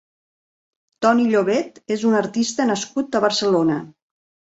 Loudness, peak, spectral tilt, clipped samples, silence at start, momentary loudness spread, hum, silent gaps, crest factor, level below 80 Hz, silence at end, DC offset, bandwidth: -20 LUFS; -2 dBFS; -4.5 dB/octave; under 0.1%; 1 s; 6 LU; none; none; 18 dB; -64 dBFS; 0.7 s; under 0.1%; 8 kHz